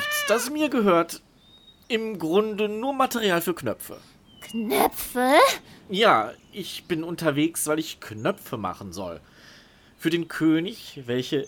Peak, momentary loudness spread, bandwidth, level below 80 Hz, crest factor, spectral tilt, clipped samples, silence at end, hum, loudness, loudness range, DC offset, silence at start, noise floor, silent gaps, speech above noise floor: -4 dBFS; 15 LU; over 20 kHz; -60 dBFS; 20 dB; -4 dB/octave; under 0.1%; 0 s; none; -24 LUFS; 6 LU; under 0.1%; 0 s; -54 dBFS; none; 29 dB